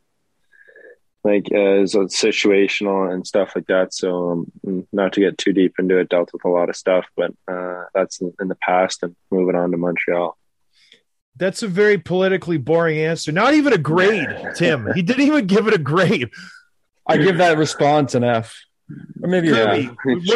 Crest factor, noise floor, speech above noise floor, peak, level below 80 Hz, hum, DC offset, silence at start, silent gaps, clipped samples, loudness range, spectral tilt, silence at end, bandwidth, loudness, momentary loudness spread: 14 dB; -71 dBFS; 53 dB; -4 dBFS; -62 dBFS; none; under 0.1%; 1.25 s; 11.21-11.32 s; under 0.1%; 4 LU; -5.5 dB/octave; 0 s; 12 kHz; -18 LUFS; 9 LU